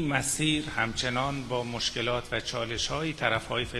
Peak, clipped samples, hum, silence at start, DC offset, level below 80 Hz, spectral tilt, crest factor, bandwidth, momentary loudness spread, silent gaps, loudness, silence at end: -8 dBFS; under 0.1%; none; 0 s; under 0.1%; -48 dBFS; -3.5 dB/octave; 22 dB; 15 kHz; 5 LU; none; -29 LUFS; 0 s